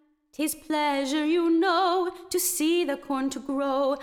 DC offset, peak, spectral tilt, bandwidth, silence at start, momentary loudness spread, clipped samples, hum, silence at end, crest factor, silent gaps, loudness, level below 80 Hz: under 0.1%; -12 dBFS; -1.5 dB/octave; 18 kHz; 0.4 s; 7 LU; under 0.1%; none; 0 s; 14 dB; none; -26 LUFS; -62 dBFS